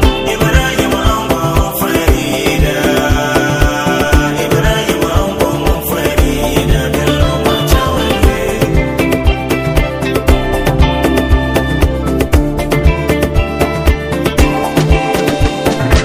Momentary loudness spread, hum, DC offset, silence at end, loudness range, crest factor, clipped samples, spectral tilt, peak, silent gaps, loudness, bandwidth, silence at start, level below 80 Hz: 3 LU; none; under 0.1%; 0 s; 1 LU; 12 dB; 0.4%; -5.5 dB/octave; 0 dBFS; none; -13 LUFS; 16.5 kHz; 0 s; -16 dBFS